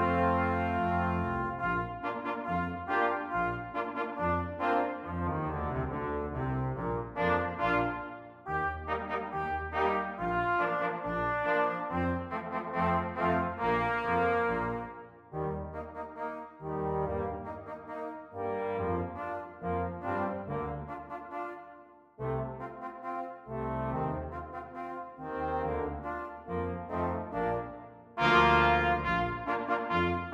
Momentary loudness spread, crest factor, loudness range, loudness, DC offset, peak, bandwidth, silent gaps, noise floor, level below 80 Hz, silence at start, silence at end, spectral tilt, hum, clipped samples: 12 LU; 22 dB; 8 LU; -32 LUFS; under 0.1%; -10 dBFS; 9.6 kHz; none; -54 dBFS; -50 dBFS; 0 s; 0 s; -7.5 dB/octave; none; under 0.1%